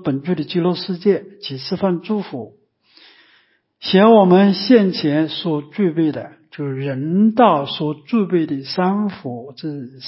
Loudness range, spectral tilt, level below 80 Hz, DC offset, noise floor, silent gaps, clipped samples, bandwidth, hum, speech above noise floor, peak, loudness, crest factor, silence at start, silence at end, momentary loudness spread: 7 LU; -10.5 dB/octave; -64 dBFS; under 0.1%; -58 dBFS; none; under 0.1%; 5.8 kHz; none; 41 dB; 0 dBFS; -17 LUFS; 18 dB; 0 s; 0 s; 17 LU